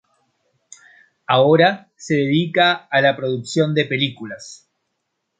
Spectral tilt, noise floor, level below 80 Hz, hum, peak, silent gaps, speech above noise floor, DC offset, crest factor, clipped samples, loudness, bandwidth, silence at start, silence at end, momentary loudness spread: -5.5 dB/octave; -75 dBFS; -64 dBFS; none; 0 dBFS; none; 57 dB; under 0.1%; 18 dB; under 0.1%; -17 LUFS; 9.4 kHz; 1.3 s; 0.85 s; 19 LU